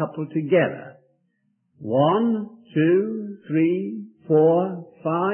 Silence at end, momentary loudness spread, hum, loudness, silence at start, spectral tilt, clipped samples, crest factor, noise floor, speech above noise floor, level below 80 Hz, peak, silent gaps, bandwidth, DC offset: 0 s; 13 LU; none; -22 LUFS; 0 s; -12 dB/octave; under 0.1%; 16 dB; -70 dBFS; 48 dB; -74 dBFS; -6 dBFS; none; 3.3 kHz; under 0.1%